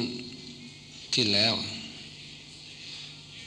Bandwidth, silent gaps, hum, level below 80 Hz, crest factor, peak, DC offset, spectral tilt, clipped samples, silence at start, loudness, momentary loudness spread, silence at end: 12 kHz; none; none; -66 dBFS; 22 dB; -10 dBFS; under 0.1%; -3 dB/octave; under 0.1%; 0 s; -27 LUFS; 21 LU; 0 s